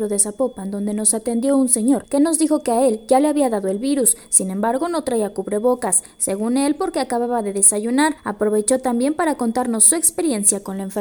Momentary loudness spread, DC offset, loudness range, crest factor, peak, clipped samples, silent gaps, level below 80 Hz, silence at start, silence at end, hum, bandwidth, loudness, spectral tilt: 8 LU; under 0.1%; 2 LU; 18 dB; 0 dBFS; under 0.1%; none; -56 dBFS; 0 s; 0 s; none; over 20 kHz; -18 LUFS; -3.5 dB/octave